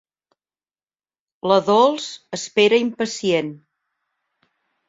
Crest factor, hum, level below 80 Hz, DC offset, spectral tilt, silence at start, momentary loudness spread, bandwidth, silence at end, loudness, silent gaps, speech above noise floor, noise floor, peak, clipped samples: 20 dB; none; -66 dBFS; under 0.1%; -4 dB/octave; 1.45 s; 13 LU; 7.8 kHz; 1.3 s; -19 LUFS; none; over 72 dB; under -90 dBFS; -2 dBFS; under 0.1%